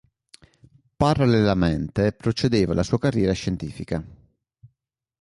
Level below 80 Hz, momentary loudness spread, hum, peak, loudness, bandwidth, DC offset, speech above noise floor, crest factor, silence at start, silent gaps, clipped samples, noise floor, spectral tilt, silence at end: -42 dBFS; 12 LU; none; -6 dBFS; -22 LUFS; 11.5 kHz; under 0.1%; 56 dB; 18 dB; 1 s; none; under 0.1%; -77 dBFS; -7 dB/octave; 1.05 s